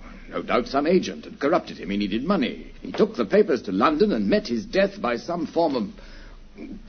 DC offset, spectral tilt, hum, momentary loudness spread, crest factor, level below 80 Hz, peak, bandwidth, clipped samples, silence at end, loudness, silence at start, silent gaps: under 0.1%; -6.5 dB/octave; none; 13 LU; 18 dB; -46 dBFS; -6 dBFS; 6.6 kHz; under 0.1%; 0 s; -23 LUFS; 0 s; none